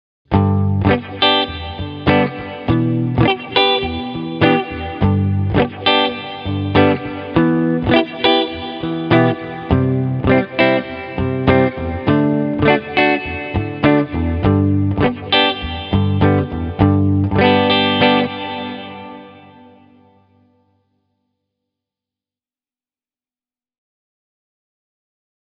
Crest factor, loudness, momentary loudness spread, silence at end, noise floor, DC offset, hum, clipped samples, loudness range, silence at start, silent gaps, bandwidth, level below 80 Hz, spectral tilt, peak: 16 dB; -16 LUFS; 10 LU; 6.1 s; under -90 dBFS; under 0.1%; none; under 0.1%; 2 LU; 0.3 s; none; 5.4 kHz; -36 dBFS; -9 dB/octave; 0 dBFS